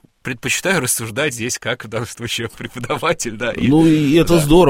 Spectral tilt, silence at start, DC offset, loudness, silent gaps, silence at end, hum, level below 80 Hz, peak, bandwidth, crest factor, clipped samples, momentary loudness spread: -4.5 dB/octave; 0.25 s; under 0.1%; -17 LUFS; none; 0 s; none; -34 dBFS; 0 dBFS; 16.5 kHz; 16 dB; under 0.1%; 12 LU